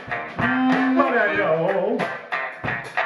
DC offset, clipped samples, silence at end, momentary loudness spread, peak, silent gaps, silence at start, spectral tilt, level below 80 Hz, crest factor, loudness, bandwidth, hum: under 0.1%; under 0.1%; 0 s; 8 LU; -6 dBFS; none; 0 s; -6.5 dB/octave; -56 dBFS; 16 dB; -21 LUFS; 11.5 kHz; none